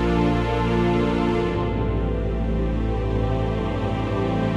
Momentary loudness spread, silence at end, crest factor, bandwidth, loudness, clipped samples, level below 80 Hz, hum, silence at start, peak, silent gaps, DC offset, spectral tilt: 4 LU; 0 s; 14 dB; 9.4 kHz; -23 LUFS; under 0.1%; -28 dBFS; none; 0 s; -8 dBFS; none; under 0.1%; -8 dB/octave